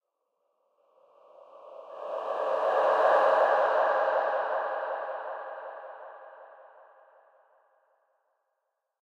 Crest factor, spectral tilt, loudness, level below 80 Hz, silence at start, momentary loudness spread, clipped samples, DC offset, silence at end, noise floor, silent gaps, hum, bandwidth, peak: 18 dB; -3 dB/octave; -27 LUFS; under -90 dBFS; 1.55 s; 24 LU; under 0.1%; under 0.1%; 2.4 s; -82 dBFS; none; none; 8.2 kHz; -12 dBFS